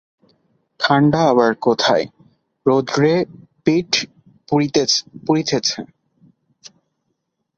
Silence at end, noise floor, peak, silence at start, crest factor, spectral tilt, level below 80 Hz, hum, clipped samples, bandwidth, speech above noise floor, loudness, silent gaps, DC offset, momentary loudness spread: 1.75 s; -73 dBFS; -2 dBFS; 0.8 s; 18 dB; -4.5 dB/octave; -58 dBFS; none; under 0.1%; 7.8 kHz; 56 dB; -17 LUFS; none; under 0.1%; 8 LU